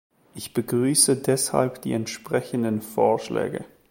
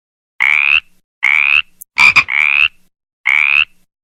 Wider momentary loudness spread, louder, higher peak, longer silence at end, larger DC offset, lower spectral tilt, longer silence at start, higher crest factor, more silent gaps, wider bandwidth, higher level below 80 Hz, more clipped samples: first, 12 LU vs 8 LU; second, -23 LUFS vs -10 LUFS; second, -4 dBFS vs 0 dBFS; second, 0.25 s vs 0.4 s; neither; first, -4 dB/octave vs 0.5 dB/octave; about the same, 0.35 s vs 0.4 s; first, 20 dB vs 14 dB; second, none vs 1.04-1.21 s, 3.13-3.24 s; about the same, 17 kHz vs 18 kHz; second, -62 dBFS vs -52 dBFS; second, under 0.1% vs 0.1%